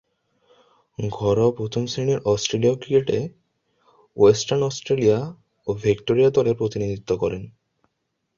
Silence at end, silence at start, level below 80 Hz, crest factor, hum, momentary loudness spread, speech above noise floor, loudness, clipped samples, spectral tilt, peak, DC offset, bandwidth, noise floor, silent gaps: 0.9 s; 1 s; -52 dBFS; 18 dB; none; 13 LU; 55 dB; -21 LUFS; under 0.1%; -6 dB/octave; -4 dBFS; under 0.1%; 7.6 kHz; -76 dBFS; none